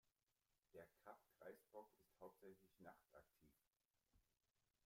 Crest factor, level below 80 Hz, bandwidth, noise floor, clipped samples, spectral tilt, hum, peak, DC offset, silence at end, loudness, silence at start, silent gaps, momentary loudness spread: 22 dB; under -90 dBFS; 16 kHz; under -90 dBFS; under 0.1%; -5.5 dB/octave; none; -46 dBFS; under 0.1%; 0.25 s; -66 LUFS; 0.05 s; 0.23-0.27 s, 3.85-3.89 s; 4 LU